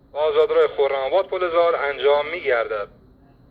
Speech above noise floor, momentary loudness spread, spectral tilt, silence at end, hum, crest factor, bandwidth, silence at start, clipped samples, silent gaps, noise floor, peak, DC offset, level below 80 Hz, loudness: 31 dB; 5 LU; -6 dB/octave; 0.65 s; none; 16 dB; 5 kHz; 0.15 s; under 0.1%; none; -51 dBFS; -6 dBFS; under 0.1%; -56 dBFS; -20 LUFS